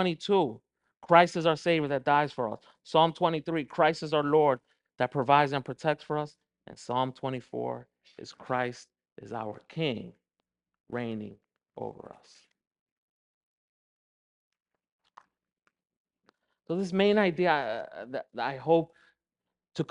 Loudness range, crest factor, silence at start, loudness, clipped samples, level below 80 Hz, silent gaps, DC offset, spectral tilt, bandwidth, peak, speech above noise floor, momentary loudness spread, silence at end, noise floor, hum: 16 LU; 26 dB; 0 s; -28 LUFS; under 0.1%; -72 dBFS; 9.12-9.16 s, 10.80-10.84 s, 12.67-12.71 s, 12.81-12.86 s, 12.92-14.51 s, 14.92-14.99 s, 15.97-16.05 s; under 0.1%; -6 dB/octave; 10.5 kHz; -4 dBFS; 61 dB; 17 LU; 0.05 s; -89 dBFS; none